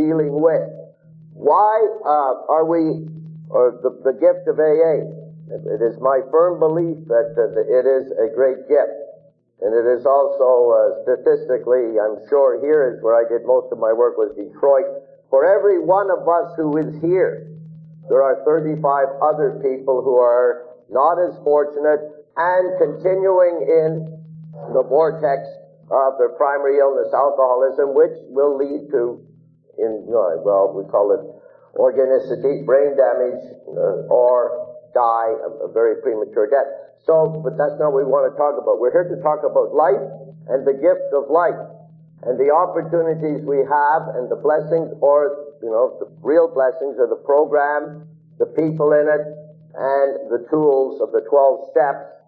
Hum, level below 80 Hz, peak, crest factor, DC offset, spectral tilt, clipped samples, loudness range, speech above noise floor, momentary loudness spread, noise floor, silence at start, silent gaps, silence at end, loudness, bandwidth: none; -70 dBFS; -2 dBFS; 14 dB; under 0.1%; -11.5 dB/octave; under 0.1%; 2 LU; 33 dB; 9 LU; -50 dBFS; 0 s; none; 0.15 s; -18 LUFS; 4.4 kHz